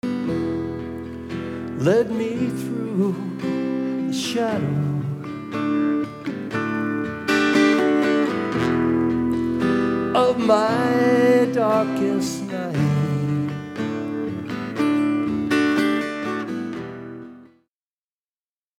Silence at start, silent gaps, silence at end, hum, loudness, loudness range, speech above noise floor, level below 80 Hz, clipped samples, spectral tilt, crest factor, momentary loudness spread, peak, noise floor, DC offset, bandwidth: 0.05 s; none; 1.35 s; none; -22 LUFS; 5 LU; over 69 dB; -58 dBFS; under 0.1%; -6.5 dB/octave; 18 dB; 11 LU; -4 dBFS; under -90 dBFS; under 0.1%; 15.5 kHz